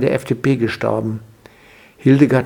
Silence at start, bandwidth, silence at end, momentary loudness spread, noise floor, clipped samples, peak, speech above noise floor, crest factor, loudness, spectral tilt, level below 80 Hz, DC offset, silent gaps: 0 s; 14 kHz; 0 s; 11 LU; -46 dBFS; under 0.1%; 0 dBFS; 31 dB; 18 dB; -17 LUFS; -8 dB/octave; -52 dBFS; under 0.1%; none